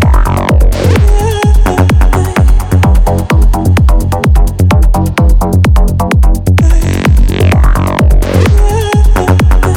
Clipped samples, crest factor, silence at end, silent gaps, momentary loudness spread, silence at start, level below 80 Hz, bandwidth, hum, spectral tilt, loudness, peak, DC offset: under 0.1%; 6 dB; 0 s; none; 2 LU; 0 s; -8 dBFS; 15.5 kHz; none; -6.5 dB/octave; -9 LUFS; 0 dBFS; under 0.1%